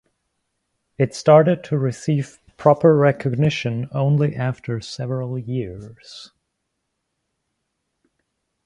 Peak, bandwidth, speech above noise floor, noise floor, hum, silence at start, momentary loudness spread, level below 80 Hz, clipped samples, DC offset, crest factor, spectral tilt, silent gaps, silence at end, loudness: 0 dBFS; 11 kHz; 57 dB; -76 dBFS; none; 1 s; 19 LU; -56 dBFS; under 0.1%; under 0.1%; 20 dB; -7.5 dB/octave; none; 2.4 s; -19 LUFS